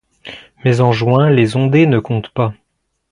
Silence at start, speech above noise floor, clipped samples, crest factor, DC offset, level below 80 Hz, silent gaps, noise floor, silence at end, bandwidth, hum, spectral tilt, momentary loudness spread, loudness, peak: 0.25 s; 24 dB; under 0.1%; 14 dB; under 0.1%; -48 dBFS; none; -36 dBFS; 0.6 s; 10.5 kHz; none; -8 dB/octave; 17 LU; -14 LUFS; 0 dBFS